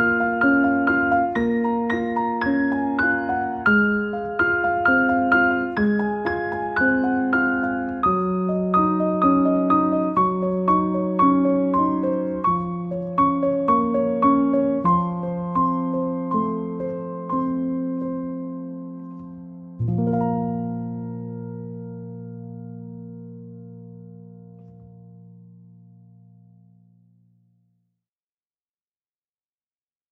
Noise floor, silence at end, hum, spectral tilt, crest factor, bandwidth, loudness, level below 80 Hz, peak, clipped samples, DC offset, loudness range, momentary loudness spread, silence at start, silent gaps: under -90 dBFS; 4.8 s; none; -9.5 dB/octave; 16 dB; 5.4 kHz; -21 LUFS; -52 dBFS; -6 dBFS; under 0.1%; under 0.1%; 15 LU; 18 LU; 0 s; none